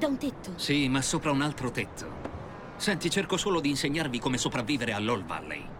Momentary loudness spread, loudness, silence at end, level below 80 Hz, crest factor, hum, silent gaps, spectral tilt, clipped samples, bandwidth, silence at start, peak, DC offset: 12 LU; -29 LUFS; 0 s; -50 dBFS; 18 dB; none; none; -4 dB/octave; under 0.1%; 16.5 kHz; 0 s; -12 dBFS; under 0.1%